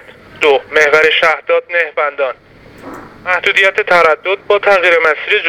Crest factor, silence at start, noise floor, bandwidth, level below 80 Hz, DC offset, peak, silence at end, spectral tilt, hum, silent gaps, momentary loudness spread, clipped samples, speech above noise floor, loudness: 12 dB; 0.35 s; -33 dBFS; 15 kHz; -52 dBFS; under 0.1%; 0 dBFS; 0 s; -2.5 dB/octave; none; none; 13 LU; 0.2%; 21 dB; -11 LUFS